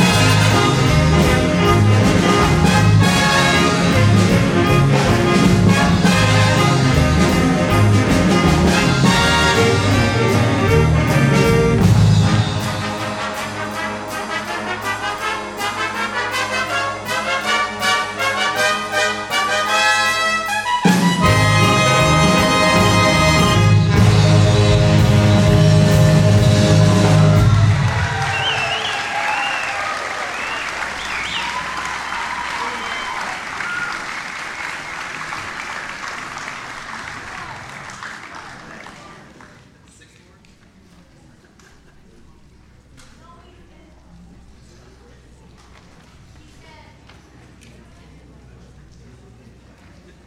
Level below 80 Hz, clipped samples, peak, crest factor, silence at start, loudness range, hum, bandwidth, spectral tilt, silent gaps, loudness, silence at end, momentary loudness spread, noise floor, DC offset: -32 dBFS; under 0.1%; -2 dBFS; 14 dB; 0 s; 14 LU; none; 16 kHz; -5 dB/octave; none; -15 LUFS; 11.15 s; 14 LU; -48 dBFS; under 0.1%